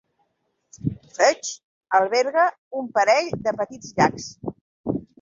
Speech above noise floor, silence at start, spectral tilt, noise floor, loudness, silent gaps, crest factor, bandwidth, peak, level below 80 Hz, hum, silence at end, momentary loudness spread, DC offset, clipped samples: 51 dB; 0.75 s; -4 dB/octave; -72 dBFS; -22 LUFS; 1.63-1.81 s, 2.58-2.71 s, 4.61-4.84 s; 20 dB; 7.8 kHz; -4 dBFS; -56 dBFS; none; 0.2 s; 14 LU; under 0.1%; under 0.1%